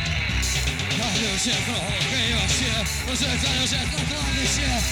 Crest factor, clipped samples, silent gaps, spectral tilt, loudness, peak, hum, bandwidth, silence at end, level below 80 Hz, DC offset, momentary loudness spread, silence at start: 14 dB; under 0.1%; none; -2.5 dB/octave; -22 LUFS; -10 dBFS; none; 19.5 kHz; 0 s; -32 dBFS; under 0.1%; 3 LU; 0 s